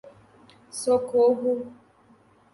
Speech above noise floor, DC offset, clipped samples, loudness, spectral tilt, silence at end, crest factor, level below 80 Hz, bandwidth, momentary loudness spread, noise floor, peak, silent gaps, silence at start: 35 dB; under 0.1%; under 0.1%; -24 LUFS; -4.5 dB/octave; 0.8 s; 16 dB; -70 dBFS; 11.5 kHz; 16 LU; -58 dBFS; -12 dBFS; none; 0.05 s